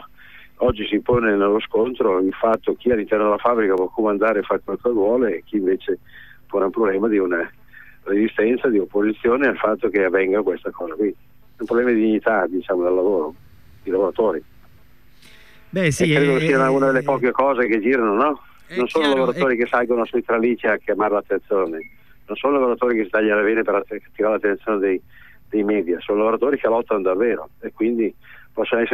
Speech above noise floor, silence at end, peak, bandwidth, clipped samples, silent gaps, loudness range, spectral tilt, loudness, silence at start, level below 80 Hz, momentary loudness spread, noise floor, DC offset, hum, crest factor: 33 dB; 0 s; -6 dBFS; 14.5 kHz; under 0.1%; none; 3 LU; -6.5 dB/octave; -20 LUFS; 0 s; -50 dBFS; 7 LU; -53 dBFS; 0.5%; none; 14 dB